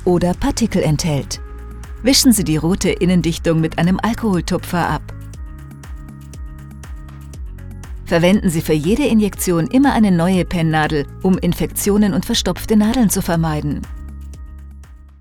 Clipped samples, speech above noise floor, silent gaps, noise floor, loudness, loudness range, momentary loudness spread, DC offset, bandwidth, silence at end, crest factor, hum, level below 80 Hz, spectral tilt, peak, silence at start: under 0.1%; 22 dB; none; -38 dBFS; -16 LUFS; 8 LU; 21 LU; under 0.1%; 18.5 kHz; 0.15 s; 16 dB; none; -32 dBFS; -5 dB/octave; -2 dBFS; 0 s